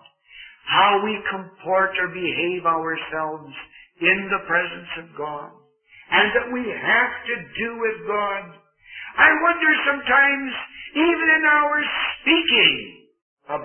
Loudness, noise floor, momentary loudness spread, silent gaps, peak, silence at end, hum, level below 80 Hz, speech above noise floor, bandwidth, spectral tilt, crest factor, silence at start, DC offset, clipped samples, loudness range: -19 LUFS; -51 dBFS; 16 LU; 13.22-13.37 s; -2 dBFS; 0 s; none; -58 dBFS; 30 dB; 3.4 kHz; -8 dB/octave; 20 dB; 0.35 s; under 0.1%; under 0.1%; 6 LU